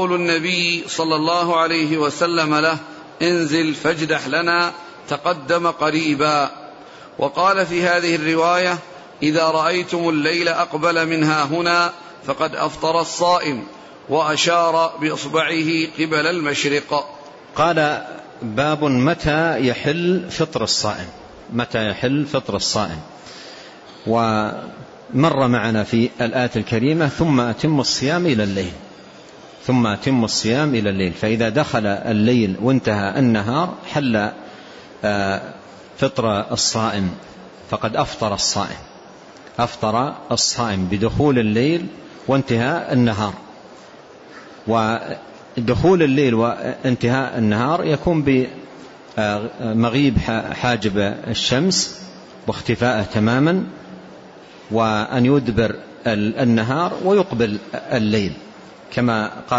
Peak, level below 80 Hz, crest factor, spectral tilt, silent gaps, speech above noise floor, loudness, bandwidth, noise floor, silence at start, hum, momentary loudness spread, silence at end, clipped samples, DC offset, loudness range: -4 dBFS; -46 dBFS; 14 dB; -5 dB/octave; none; 23 dB; -19 LUFS; 8 kHz; -42 dBFS; 0 s; none; 13 LU; 0 s; under 0.1%; under 0.1%; 4 LU